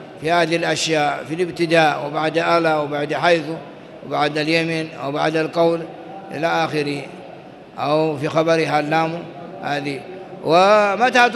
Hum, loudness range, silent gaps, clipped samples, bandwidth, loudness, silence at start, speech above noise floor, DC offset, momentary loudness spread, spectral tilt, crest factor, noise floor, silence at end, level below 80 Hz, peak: none; 3 LU; none; under 0.1%; 12 kHz; -19 LUFS; 0 s; 21 dB; under 0.1%; 17 LU; -5 dB/octave; 18 dB; -39 dBFS; 0 s; -62 dBFS; -2 dBFS